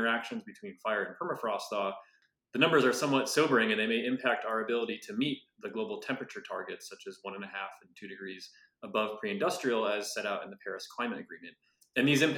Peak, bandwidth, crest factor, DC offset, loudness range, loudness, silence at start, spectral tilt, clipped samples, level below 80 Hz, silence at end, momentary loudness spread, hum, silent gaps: -10 dBFS; 18 kHz; 22 dB; under 0.1%; 10 LU; -32 LUFS; 0 s; -4 dB/octave; under 0.1%; -90 dBFS; 0 s; 17 LU; none; none